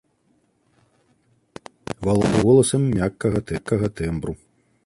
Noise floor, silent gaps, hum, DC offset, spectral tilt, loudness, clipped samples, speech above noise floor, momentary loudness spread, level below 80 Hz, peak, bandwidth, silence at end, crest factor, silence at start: -65 dBFS; none; none; under 0.1%; -6.5 dB/octave; -21 LUFS; under 0.1%; 45 dB; 23 LU; -42 dBFS; -4 dBFS; 11.5 kHz; 0.5 s; 18 dB; 1.9 s